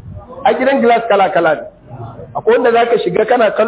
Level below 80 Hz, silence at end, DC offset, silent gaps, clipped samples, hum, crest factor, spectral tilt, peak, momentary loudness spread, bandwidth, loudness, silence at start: -46 dBFS; 0 s; under 0.1%; none; under 0.1%; none; 12 dB; -9 dB/octave; 0 dBFS; 20 LU; 4 kHz; -13 LUFS; 0.05 s